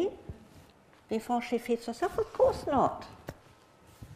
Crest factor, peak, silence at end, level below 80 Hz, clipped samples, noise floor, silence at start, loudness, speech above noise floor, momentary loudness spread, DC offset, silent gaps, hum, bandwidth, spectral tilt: 20 dB; -14 dBFS; 0 s; -56 dBFS; under 0.1%; -59 dBFS; 0 s; -31 LUFS; 29 dB; 20 LU; under 0.1%; none; none; 15.5 kHz; -6 dB/octave